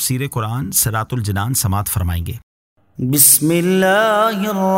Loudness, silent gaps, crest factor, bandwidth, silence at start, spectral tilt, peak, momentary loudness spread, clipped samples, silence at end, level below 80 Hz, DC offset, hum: -15 LUFS; 2.43-2.76 s; 16 dB; 16.5 kHz; 0 s; -4 dB/octave; 0 dBFS; 13 LU; under 0.1%; 0 s; -38 dBFS; under 0.1%; none